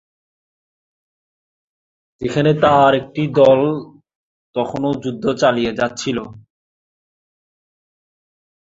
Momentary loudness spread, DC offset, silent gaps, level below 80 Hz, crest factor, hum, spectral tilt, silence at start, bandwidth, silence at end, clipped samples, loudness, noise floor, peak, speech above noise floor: 14 LU; under 0.1%; 4.16-4.53 s; -54 dBFS; 18 dB; none; -6 dB/octave; 2.2 s; 8 kHz; 2.25 s; under 0.1%; -17 LUFS; under -90 dBFS; -2 dBFS; over 74 dB